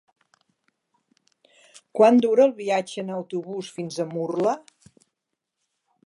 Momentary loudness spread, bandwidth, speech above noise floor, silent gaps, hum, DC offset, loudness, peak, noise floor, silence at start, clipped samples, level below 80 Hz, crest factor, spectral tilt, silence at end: 15 LU; 11.5 kHz; 60 dB; none; none; under 0.1%; -23 LUFS; -4 dBFS; -82 dBFS; 1.95 s; under 0.1%; -78 dBFS; 22 dB; -6 dB/octave; 1.5 s